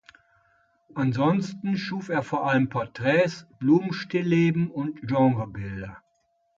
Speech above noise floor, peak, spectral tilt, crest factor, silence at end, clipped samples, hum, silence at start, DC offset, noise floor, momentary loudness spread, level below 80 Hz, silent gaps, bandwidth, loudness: 46 dB; -8 dBFS; -7.5 dB/octave; 16 dB; 0.6 s; under 0.1%; none; 0.95 s; under 0.1%; -70 dBFS; 11 LU; -58 dBFS; none; 7.6 kHz; -25 LUFS